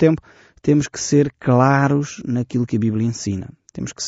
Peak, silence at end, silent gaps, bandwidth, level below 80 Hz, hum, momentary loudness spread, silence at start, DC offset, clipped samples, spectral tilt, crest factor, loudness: -2 dBFS; 0 s; none; 8 kHz; -52 dBFS; none; 13 LU; 0 s; under 0.1%; under 0.1%; -7 dB/octave; 16 dB; -19 LUFS